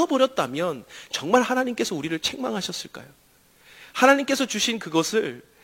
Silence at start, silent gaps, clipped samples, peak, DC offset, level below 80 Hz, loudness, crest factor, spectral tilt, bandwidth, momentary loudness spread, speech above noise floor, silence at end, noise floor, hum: 0 s; none; under 0.1%; -2 dBFS; under 0.1%; -66 dBFS; -23 LUFS; 22 dB; -3 dB/octave; 16.5 kHz; 14 LU; 33 dB; 0.25 s; -56 dBFS; none